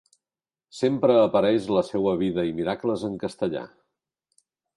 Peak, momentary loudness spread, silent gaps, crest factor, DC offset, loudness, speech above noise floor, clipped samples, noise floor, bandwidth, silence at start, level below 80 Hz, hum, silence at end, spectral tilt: -6 dBFS; 11 LU; none; 18 dB; under 0.1%; -24 LUFS; over 67 dB; under 0.1%; under -90 dBFS; 11.5 kHz; 0.75 s; -58 dBFS; none; 1.1 s; -7 dB/octave